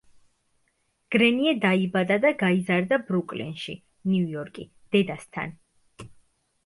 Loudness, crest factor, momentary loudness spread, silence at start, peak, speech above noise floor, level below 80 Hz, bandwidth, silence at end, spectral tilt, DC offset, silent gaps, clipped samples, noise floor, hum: -24 LUFS; 18 dB; 15 LU; 1.1 s; -8 dBFS; 47 dB; -66 dBFS; 11.5 kHz; 0.6 s; -6.5 dB/octave; under 0.1%; none; under 0.1%; -71 dBFS; none